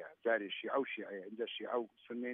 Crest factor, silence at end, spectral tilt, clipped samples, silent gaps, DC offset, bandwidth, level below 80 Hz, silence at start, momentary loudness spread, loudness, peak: 18 dB; 0 s; -1 dB/octave; under 0.1%; none; under 0.1%; 3.8 kHz; under -90 dBFS; 0 s; 8 LU; -40 LUFS; -22 dBFS